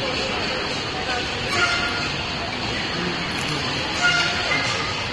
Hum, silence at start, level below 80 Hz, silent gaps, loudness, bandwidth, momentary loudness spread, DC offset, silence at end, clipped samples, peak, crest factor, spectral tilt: none; 0 s; -42 dBFS; none; -22 LUFS; 11 kHz; 6 LU; under 0.1%; 0 s; under 0.1%; -6 dBFS; 16 dB; -3 dB/octave